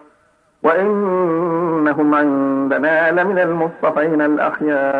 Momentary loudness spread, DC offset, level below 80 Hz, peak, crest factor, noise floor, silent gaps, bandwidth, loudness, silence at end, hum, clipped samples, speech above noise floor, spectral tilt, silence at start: 4 LU; under 0.1%; -64 dBFS; -2 dBFS; 14 dB; -57 dBFS; none; 4.5 kHz; -16 LUFS; 0 s; none; under 0.1%; 41 dB; -9 dB/octave; 0.65 s